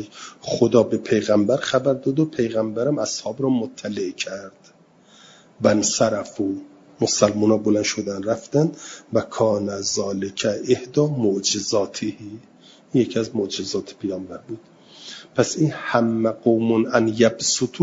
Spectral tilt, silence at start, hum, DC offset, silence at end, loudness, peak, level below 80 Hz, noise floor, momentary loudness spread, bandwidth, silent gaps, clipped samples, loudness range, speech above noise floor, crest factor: -4.5 dB/octave; 0 s; none; under 0.1%; 0 s; -21 LUFS; -2 dBFS; -62 dBFS; -52 dBFS; 12 LU; 7.8 kHz; none; under 0.1%; 5 LU; 30 dB; 20 dB